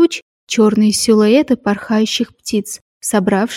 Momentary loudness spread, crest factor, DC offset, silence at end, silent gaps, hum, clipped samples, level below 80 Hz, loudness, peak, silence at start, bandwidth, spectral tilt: 9 LU; 14 dB; under 0.1%; 0 s; 0.22-0.47 s, 2.81-3.00 s; none; under 0.1%; -54 dBFS; -15 LUFS; -2 dBFS; 0 s; 16 kHz; -4.5 dB/octave